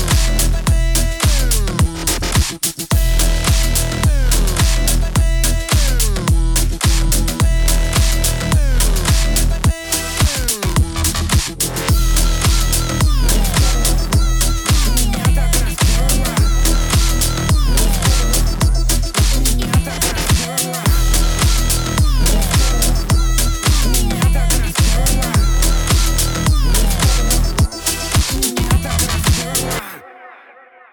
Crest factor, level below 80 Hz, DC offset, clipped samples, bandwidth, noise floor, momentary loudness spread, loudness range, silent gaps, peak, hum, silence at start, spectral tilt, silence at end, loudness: 12 dB; -16 dBFS; under 0.1%; under 0.1%; over 20 kHz; -43 dBFS; 2 LU; 1 LU; none; -2 dBFS; none; 0 s; -3.5 dB/octave; 0.6 s; -16 LUFS